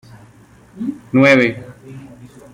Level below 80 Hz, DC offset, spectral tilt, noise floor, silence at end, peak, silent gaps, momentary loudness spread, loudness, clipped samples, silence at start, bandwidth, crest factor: -56 dBFS; under 0.1%; -6.5 dB/octave; -46 dBFS; 0.3 s; -2 dBFS; none; 26 LU; -14 LUFS; under 0.1%; 0.75 s; 11.5 kHz; 18 dB